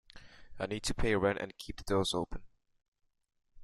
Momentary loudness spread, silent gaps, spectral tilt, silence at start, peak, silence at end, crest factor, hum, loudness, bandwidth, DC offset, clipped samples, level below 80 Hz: 13 LU; 2.88-2.92 s; -4.5 dB/octave; 0.15 s; -16 dBFS; 0 s; 20 dB; none; -34 LUFS; 13.5 kHz; under 0.1%; under 0.1%; -46 dBFS